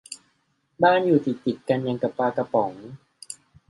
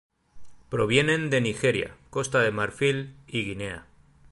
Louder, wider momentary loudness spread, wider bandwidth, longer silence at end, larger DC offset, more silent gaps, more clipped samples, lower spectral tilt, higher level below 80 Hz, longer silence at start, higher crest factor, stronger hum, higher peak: first, -23 LUFS vs -26 LUFS; first, 21 LU vs 11 LU; about the same, 11.5 kHz vs 11.5 kHz; second, 0.35 s vs 0.5 s; neither; neither; neither; about the same, -6 dB/octave vs -5 dB/octave; second, -68 dBFS vs -54 dBFS; second, 0.1 s vs 0.35 s; about the same, 20 dB vs 22 dB; neither; about the same, -6 dBFS vs -6 dBFS